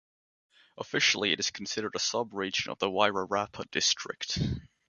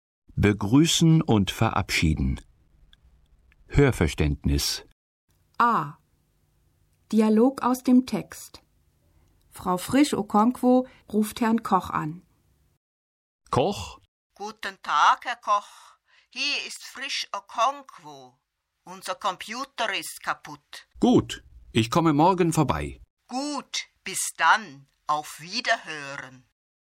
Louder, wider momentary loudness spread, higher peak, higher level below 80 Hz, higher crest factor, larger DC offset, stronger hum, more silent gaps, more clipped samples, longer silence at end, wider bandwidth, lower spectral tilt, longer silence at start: second, -29 LUFS vs -24 LUFS; second, 8 LU vs 17 LU; about the same, -8 dBFS vs -6 dBFS; second, -54 dBFS vs -42 dBFS; about the same, 24 dB vs 20 dB; neither; neither; second, none vs 4.92-5.28 s, 12.77-13.39 s, 14.08-14.30 s, 23.10-23.17 s; neither; second, 0.25 s vs 0.7 s; second, 10.5 kHz vs 16.5 kHz; second, -2.5 dB/octave vs -5 dB/octave; first, 0.75 s vs 0.35 s